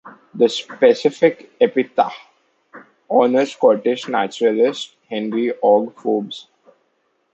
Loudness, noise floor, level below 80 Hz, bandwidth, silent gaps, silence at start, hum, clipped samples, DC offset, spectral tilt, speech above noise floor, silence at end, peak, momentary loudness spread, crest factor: -18 LUFS; -66 dBFS; -72 dBFS; 8.2 kHz; none; 0.05 s; none; under 0.1%; under 0.1%; -5 dB/octave; 49 dB; 0.95 s; -2 dBFS; 11 LU; 16 dB